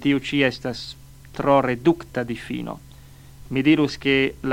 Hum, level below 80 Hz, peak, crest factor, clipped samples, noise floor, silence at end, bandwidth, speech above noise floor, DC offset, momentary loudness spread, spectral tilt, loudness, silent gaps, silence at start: none; -48 dBFS; -4 dBFS; 18 dB; under 0.1%; -45 dBFS; 0 s; 16 kHz; 23 dB; under 0.1%; 15 LU; -6 dB/octave; -22 LUFS; none; 0 s